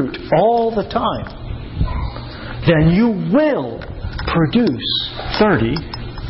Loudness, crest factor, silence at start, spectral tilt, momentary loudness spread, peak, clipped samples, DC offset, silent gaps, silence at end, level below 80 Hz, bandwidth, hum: -17 LUFS; 14 dB; 0 s; -11 dB/octave; 15 LU; -4 dBFS; under 0.1%; under 0.1%; none; 0 s; -30 dBFS; 5.8 kHz; none